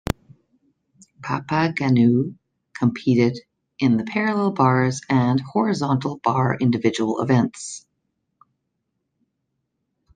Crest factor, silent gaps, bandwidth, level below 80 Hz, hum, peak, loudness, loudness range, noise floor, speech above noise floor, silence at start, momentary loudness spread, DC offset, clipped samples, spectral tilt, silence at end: 20 dB; none; 9.6 kHz; -54 dBFS; none; -4 dBFS; -21 LUFS; 4 LU; -76 dBFS; 56 dB; 0.05 s; 12 LU; under 0.1%; under 0.1%; -6.5 dB/octave; 2.35 s